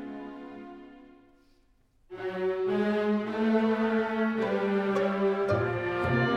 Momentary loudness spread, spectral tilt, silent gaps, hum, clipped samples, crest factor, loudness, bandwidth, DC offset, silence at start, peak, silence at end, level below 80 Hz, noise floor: 17 LU; -8 dB/octave; none; none; under 0.1%; 14 dB; -28 LUFS; 8.2 kHz; under 0.1%; 0 s; -14 dBFS; 0 s; -60 dBFS; -65 dBFS